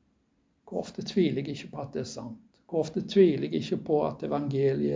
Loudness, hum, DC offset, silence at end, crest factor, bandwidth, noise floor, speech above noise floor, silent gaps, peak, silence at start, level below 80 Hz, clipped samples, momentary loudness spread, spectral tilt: -29 LUFS; none; under 0.1%; 0 s; 20 dB; 7.6 kHz; -71 dBFS; 43 dB; none; -10 dBFS; 0.65 s; -64 dBFS; under 0.1%; 15 LU; -7 dB/octave